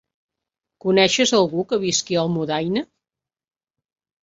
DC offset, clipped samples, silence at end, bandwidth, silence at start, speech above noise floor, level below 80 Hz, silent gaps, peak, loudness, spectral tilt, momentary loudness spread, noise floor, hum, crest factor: under 0.1%; under 0.1%; 1.4 s; 7.8 kHz; 0.85 s; 68 dB; -62 dBFS; none; -2 dBFS; -20 LUFS; -3.5 dB/octave; 10 LU; -87 dBFS; none; 20 dB